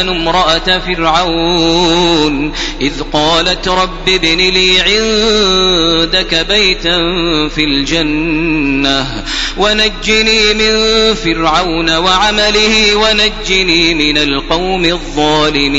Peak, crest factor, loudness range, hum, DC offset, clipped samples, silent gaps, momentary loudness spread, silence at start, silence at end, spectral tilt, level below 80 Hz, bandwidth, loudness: 0 dBFS; 12 dB; 2 LU; none; under 0.1%; under 0.1%; none; 5 LU; 0 s; 0 s; -3 dB/octave; -24 dBFS; 11 kHz; -10 LUFS